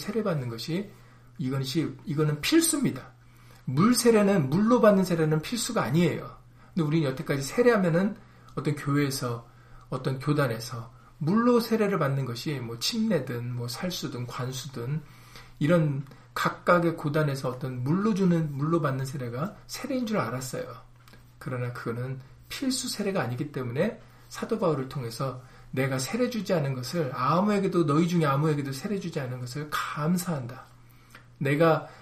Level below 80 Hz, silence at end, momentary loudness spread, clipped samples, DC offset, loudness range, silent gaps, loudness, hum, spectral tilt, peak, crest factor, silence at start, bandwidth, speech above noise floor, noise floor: -56 dBFS; 0 s; 13 LU; under 0.1%; under 0.1%; 8 LU; none; -27 LUFS; none; -5.5 dB/octave; -8 dBFS; 20 dB; 0 s; 15.5 kHz; 26 dB; -52 dBFS